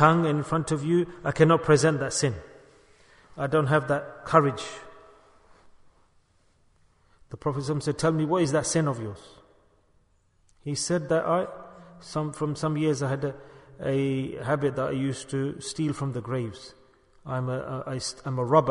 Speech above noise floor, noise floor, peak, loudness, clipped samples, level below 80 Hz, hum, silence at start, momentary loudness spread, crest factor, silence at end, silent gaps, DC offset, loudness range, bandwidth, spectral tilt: 39 dB; -65 dBFS; -4 dBFS; -26 LUFS; under 0.1%; -58 dBFS; none; 0 s; 16 LU; 24 dB; 0 s; none; under 0.1%; 7 LU; 11 kHz; -5.5 dB/octave